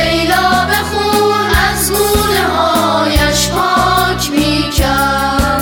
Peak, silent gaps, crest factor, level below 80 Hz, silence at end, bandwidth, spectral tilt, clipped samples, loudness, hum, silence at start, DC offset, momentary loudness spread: 0 dBFS; none; 12 dB; -24 dBFS; 0 s; over 20 kHz; -3.5 dB/octave; under 0.1%; -12 LUFS; none; 0 s; under 0.1%; 2 LU